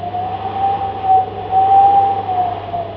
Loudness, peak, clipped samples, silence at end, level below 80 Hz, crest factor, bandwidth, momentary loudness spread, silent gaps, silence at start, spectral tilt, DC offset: -15 LUFS; -2 dBFS; under 0.1%; 0 s; -46 dBFS; 12 dB; 5.4 kHz; 12 LU; none; 0 s; -8.5 dB/octave; under 0.1%